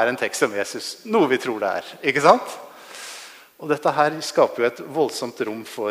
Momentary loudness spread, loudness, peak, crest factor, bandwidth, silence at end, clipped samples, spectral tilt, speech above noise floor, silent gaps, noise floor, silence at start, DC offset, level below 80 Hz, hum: 19 LU; -21 LUFS; 0 dBFS; 22 dB; 15.5 kHz; 0 s; under 0.1%; -4 dB/octave; 20 dB; none; -42 dBFS; 0 s; under 0.1%; -72 dBFS; none